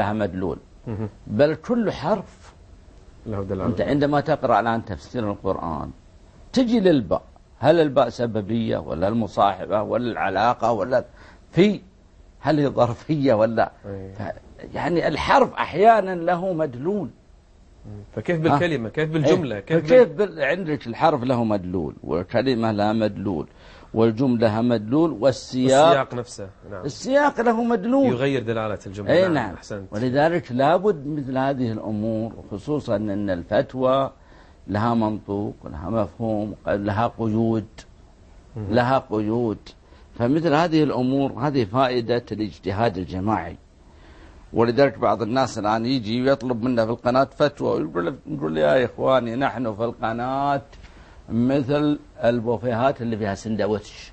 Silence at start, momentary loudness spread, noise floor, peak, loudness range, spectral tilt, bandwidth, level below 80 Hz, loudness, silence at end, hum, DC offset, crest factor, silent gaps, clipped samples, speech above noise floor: 0 s; 11 LU; -51 dBFS; -2 dBFS; 4 LU; -7 dB/octave; 8.8 kHz; -48 dBFS; -22 LUFS; 0 s; none; under 0.1%; 20 dB; none; under 0.1%; 29 dB